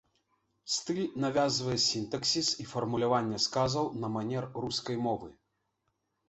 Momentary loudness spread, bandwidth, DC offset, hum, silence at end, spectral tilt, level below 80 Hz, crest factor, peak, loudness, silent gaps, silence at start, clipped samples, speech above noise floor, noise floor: 7 LU; 8.4 kHz; under 0.1%; none; 0.95 s; -4 dB/octave; -64 dBFS; 18 dB; -16 dBFS; -31 LUFS; none; 0.65 s; under 0.1%; 49 dB; -80 dBFS